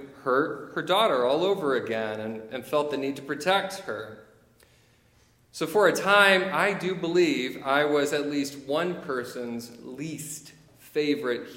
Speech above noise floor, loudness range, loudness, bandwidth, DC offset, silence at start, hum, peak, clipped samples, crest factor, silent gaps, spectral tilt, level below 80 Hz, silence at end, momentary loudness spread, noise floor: 36 dB; 8 LU; -26 LUFS; 16.5 kHz; under 0.1%; 0 s; none; -4 dBFS; under 0.1%; 24 dB; none; -4 dB/octave; -70 dBFS; 0 s; 14 LU; -61 dBFS